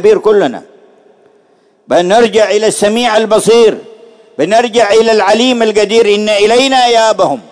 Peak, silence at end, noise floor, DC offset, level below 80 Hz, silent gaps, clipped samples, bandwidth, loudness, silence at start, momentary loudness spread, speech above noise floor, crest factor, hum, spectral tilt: 0 dBFS; 0.1 s; -50 dBFS; under 0.1%; -50 dBFS; none; 0.7%; 11 kHz; -9 LUFS; 0 s; 5 LU; 41 dB; 10 dB; none; -3.5 dB/octave